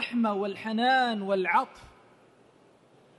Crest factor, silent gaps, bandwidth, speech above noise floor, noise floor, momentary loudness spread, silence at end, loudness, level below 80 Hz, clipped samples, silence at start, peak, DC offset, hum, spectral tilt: 18 dB; none; 11.5 kHz; 33 dB; -60 dBFS; 8 LU; 1.35 s; -27 LUFS; -70 dBFS; under 0.1%; 0 s; -12 dBFS; under 0.1%; none; -5.5 dB/octave